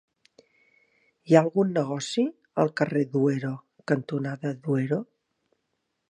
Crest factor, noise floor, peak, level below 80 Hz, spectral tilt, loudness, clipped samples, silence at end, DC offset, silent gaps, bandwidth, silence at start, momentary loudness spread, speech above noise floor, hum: 24 dB; -78 dBFS; -2 dBFS; -74 dBFS; -6.5 dB/octave; -26 LUFS; under 0.1%; 1.1 s; under 0.1%; none; 10.5 kHz; 1.25 s; 10 LU; 53 dB; none